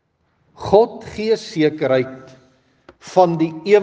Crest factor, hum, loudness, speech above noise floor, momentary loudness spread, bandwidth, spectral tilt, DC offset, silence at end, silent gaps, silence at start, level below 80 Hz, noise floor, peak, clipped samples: 18 dB; none; -18 LUFS; 47 dB; 9 LU; 8.4 kHz; -6.5 dB/octave; under 0.1%; 0 s; none; 0.6 s; -54 dBFS; -63 dBFS; 0 dBFS; under 0.1%